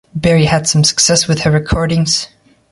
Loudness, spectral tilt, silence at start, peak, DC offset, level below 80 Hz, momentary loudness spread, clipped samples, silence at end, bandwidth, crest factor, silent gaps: -12 LUFS; -4 dB/octave; 0.15 s; 0 dBFS; under 0.1%; -32 dBFS; 5 LU; under 0.1%; 0.45 s; 11.5 kHz; 14 dB; none